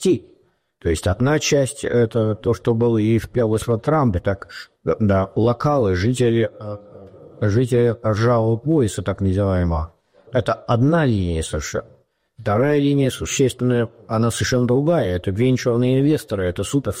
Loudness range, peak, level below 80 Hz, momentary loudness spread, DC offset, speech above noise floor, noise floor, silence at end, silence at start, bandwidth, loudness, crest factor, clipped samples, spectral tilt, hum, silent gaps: 2 LU; -8 dBFS; -40 dBFS; 8 LU; under 0.1%; 39 dB; -57 dBFS; 0 s; 0 s; 16 kHz; -19 LUFS; 12 dB; under 0.1%; -6.5 dB/octave; none; none